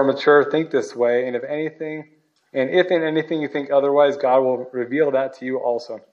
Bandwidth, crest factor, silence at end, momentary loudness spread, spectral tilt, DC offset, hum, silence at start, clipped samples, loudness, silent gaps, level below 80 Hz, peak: 7.6 kHz; 16 dB; 0.15 s; 11 LU; -6 dB/octave; under 0.1%; none; 0 s; under 0.1%; -20 LUFS; none; -80 dBFS; -4 dBFS